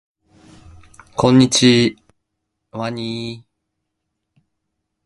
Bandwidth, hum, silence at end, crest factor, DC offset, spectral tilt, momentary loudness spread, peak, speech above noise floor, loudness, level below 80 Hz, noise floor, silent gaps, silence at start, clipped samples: 11.5 kHz; none; 1.65 s; 20 dB; under 0.1%; -4.5 dB/octave; 19 LU; 0 dBFS; 61 dB; -16 LUFS; -52 dBFS; -76 dBFS; none; 1.15 s; under 0.1%